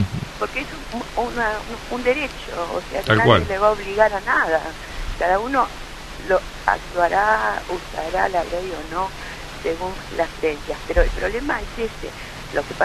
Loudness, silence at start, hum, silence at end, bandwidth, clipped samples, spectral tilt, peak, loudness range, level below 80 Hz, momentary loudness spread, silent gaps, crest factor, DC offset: -22 LUFS; 0 s; none; 0 s; 13.5 kHz; under 0.1%; -5 dB/octave; 0 dBFS; 6 LU; -34 dBFS; 12 LU; none; 22 dB; under 0.1%